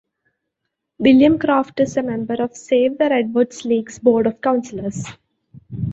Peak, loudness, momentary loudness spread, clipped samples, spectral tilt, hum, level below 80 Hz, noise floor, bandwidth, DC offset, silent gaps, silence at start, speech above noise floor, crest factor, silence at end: -2 dBFS; -18 LUFS; 14 LU; under 0.1%; -6 dB/octave; none; -50 dBFS; -78 dBFS; 8 kHz; under 0.1%; none; 1 s; 61 dB; 16 dB; 0 s